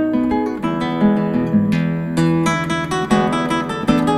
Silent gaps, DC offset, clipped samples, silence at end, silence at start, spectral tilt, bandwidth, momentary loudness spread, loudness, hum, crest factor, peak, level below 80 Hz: none; under 0.1%; under 0.1%; 0 s; 0 s; -6.5 dB/octave; 12.5 kHz; 4 LU; -18 LUFS; none; 14 dB; -2 dBFS; -42 dBFS